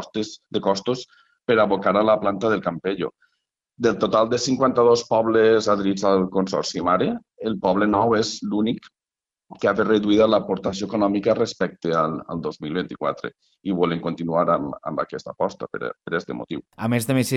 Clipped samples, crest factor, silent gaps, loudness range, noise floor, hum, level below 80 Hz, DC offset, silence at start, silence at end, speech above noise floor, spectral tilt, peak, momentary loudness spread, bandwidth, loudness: under 0.1%; 14 dB; none; 6 LU; under -90 dBFS; none; -56 dBFS; under 0.1%; 0 s; 0 s; over 69 dB; -5.5 dB/octave; -6 dBFS; 12 LU; 13 kHz; -22 LUFS